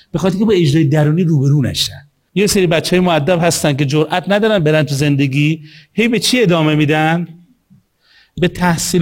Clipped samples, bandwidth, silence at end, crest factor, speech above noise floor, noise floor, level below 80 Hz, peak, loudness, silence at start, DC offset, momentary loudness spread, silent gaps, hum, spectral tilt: under 0.1%; 16.5 kHz; 0 s; 14 dB; 39 dB; -52 dBFS; -44 dBFS; 0 dBFS; -14 LUFS; 0.15 s; under 0.1%; 6 LU; none; none; -5.5 dB/octave